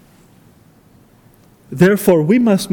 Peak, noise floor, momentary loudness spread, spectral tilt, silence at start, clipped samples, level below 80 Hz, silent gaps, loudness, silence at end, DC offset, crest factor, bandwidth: 0 dBFS; -49 dBFS; 5 LU; -6.5 dB/octave; 1.7 s; under 0.1%; -52 dBFS; none; -13 LUFS; 0 s; under 0.1%; 16 dB; 19 kHz